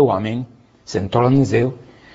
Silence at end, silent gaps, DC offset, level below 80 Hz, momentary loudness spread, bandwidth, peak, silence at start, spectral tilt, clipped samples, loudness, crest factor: 0.35 s; none; under 0.1%; -48 dBFS; 16 LU; 8 kHz; -2 dBFS; 0 s; -7.5 dB/octave; under 0.1%; -19 LUFS; 16 dB